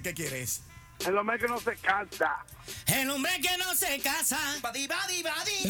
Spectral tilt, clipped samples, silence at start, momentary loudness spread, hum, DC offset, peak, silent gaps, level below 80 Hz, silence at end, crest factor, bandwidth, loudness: -2 dB/octave; under 0.1%; 0 s; 7 LU; none; under 0.1%; -10 dBFS; none; -58 dBFS; 0 s; 20 dB; over 20 kHz; -29 LUFS